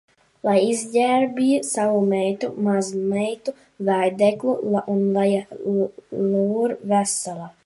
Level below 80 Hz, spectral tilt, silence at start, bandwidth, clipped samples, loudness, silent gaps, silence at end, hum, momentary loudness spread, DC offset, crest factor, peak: -68 dBFS; -5.5 dB/octave; 0.45 s; 11.5 kHz; under 0.1%; -22 LUFS; none; 0.15 s; none; 6 LU; under 0.1%; 16 dB; -6 dBFS